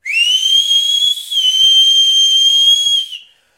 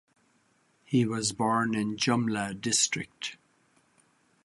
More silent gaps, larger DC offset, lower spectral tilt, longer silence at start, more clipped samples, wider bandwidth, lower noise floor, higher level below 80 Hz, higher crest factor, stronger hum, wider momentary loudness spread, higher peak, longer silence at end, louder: neither; neither; second, 5.5 dB/octave vs -3.5 dB/octave; second, 0.05 s vs 0.9 s; neither; first, 16 kHz vs 11.5 kHz; second, -34 dBFS vs -68 dBFS; first, -60 dBFS vs -66 dBFS; second, 10 dB vs 20 dB; neither; second, 6 LU vs 10 LU; first, -2 dBFS vs -12 dBFS; second, 0.4 s vs 1.1 s; first, -8 LUFS vs -28 LUFS